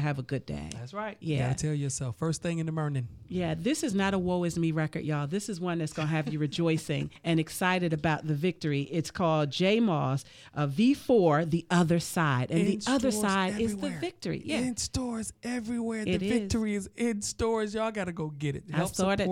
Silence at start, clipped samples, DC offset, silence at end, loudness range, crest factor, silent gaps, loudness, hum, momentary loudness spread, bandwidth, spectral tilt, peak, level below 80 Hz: 0 s; under 0.1%; under 0.1%; 0 s; 5 LU; 18 dB; none; -29 LUFS; none; 9 LU; 16 kHz; -5.5 dB/octave; -12 dBFS; -54 dBFS